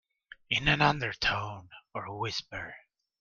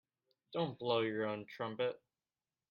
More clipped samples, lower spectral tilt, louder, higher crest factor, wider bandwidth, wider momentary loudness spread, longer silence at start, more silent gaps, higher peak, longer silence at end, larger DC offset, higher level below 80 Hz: neither; second, -4.5 dB/octave vs -7.5 dB/octave; first, -29 LUFS vs -39 LUFS; about the same, 22 dB vs 20 dB; first, 7.4 kHz vs 6.6 kHz; first, 17 LU vs 9 LU; about the same, 0.5 s vs 0.5 s; neither; first, -10 dBFS vs -20 dBFS; second, 0.4 s vs 0.75 s; neither; first, -52 dBFS vs -82 dBFS